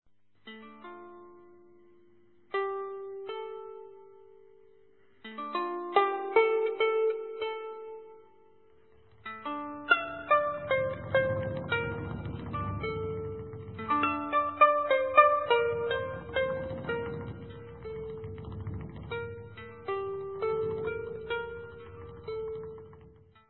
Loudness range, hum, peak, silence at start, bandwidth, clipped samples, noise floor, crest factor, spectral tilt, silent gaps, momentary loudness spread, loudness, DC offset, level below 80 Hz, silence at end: 14 LU; none; -8 dBFS; 0.45 s; 4.2 kHz; under 0.1%; -64 dBFS; 24 dB; -3.5 dB/octave; none; 20 LU; -31 LUFS; under 0.1%; -56 dBFS; 0.4 s